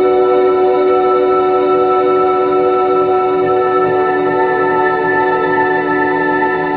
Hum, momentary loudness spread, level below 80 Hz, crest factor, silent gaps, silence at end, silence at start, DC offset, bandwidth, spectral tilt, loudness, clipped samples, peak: none; 2 LU; -50 dBFS; 10 dB; none; 0 s; 0 s; under 0.1%; 4.7 kHz; -9 dB/octave; -12 LUFS; under 0.1%; -2 dBFS